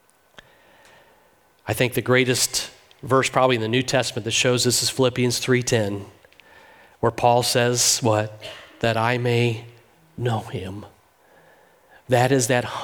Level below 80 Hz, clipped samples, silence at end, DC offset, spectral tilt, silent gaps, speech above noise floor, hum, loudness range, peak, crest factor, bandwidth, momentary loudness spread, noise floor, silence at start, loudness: -56 dBFS; under 0.1%; 0 s; under 0.1%; -3.5 dB/octave; none; 37 dB; none; 6 LU; -4 dBFS; 20 dB; 19.5 kHz; 15 LU; -58 dBFS; 1.65 s; -21 LUFS